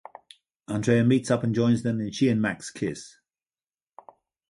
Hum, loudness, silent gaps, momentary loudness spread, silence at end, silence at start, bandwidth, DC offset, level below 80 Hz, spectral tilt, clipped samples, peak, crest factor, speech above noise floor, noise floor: none; -25 LUFS; none; 11 LU; 1.4 s; 0.7 s; 11.5 kHz; under 0.1%; -62 dBFS; -6.5 dB/octave; under 0.1%; -8 dBFS; 20 dB; over 66 dB; under -90 dBFS